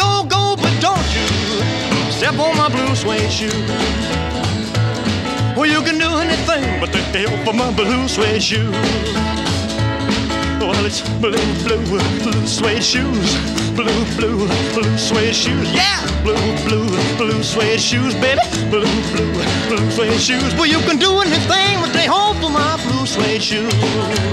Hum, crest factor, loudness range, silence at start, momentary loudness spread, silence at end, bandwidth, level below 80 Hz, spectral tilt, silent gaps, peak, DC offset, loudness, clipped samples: none; 14 dB; 3 LU; 0 s; 4 LU; 0 s; 13.5 kHz; -32 dBFS; -4.5 dB/octave; none; -2 dBFS; under 0.1%; -16 LUFS; under 0.1%